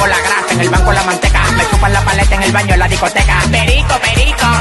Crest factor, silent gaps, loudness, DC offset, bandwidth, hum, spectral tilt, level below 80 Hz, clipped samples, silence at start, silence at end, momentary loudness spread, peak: 10 dB; none; -11 LUFS; under 0.1%; 12.5 kHz; none; -4 dB/octave; -16 dBFS; under 0.1%; 0 s; 0 s; 1 LU; 0 dBFS